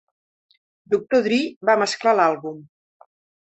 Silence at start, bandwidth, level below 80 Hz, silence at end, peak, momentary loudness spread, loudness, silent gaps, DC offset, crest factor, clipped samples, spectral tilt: 0.9 s; 8.4 kHz; -68 dBFS; 0.8 s; -4 dBFS; 12 LU; -20 LUFS; 1.56-1.61 s; under 0.1%; 18 dB; under 0.1%; -4 dB/octave